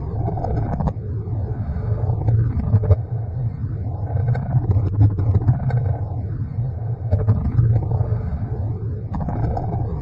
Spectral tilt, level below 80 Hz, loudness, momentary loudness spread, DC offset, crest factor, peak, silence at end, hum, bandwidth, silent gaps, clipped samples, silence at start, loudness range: -12 dB/octave; -32 dBFS; -22 LUFS; 8 LU; under 0.1%; 16 dB; -4 dBFS; 0 s; none; 2.4 kHz; none; under 0.1%; 0 s; 2 LU